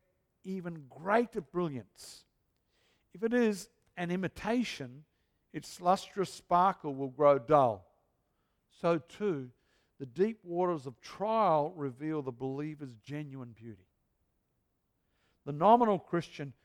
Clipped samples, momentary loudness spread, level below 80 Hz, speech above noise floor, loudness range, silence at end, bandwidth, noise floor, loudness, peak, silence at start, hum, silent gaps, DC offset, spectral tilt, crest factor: under 0.1%; 20 LU; -70 dBFS; 47 dB; 7 LU; 0.1 s; 16 kHz; -79 dBFS; -32 LUFS; -10 dBFS; 0.45 s; none; none; under 0.1%; -6.5 dB/octave; 22 dB